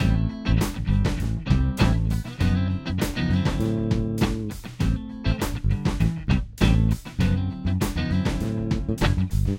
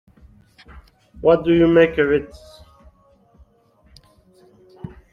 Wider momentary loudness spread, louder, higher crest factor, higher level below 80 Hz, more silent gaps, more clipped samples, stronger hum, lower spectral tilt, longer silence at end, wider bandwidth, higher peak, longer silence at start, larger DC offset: second, 5 LU vs 25 LU; second, -25 LUFS vs -16 LUFS; about the same, 18 dB vs 20 dB; first, -28 dBFS vs -46 dBFS; neither; neither; neither; second, -6.5 dB/octave vs -8 dB/octave; second, 0 s vs 0.25 s; first, 16.5 kHz vs 6.4 kHz; second, -6 dBFS vs -2 dBFS; second, 0 s vs 0.75 s; neither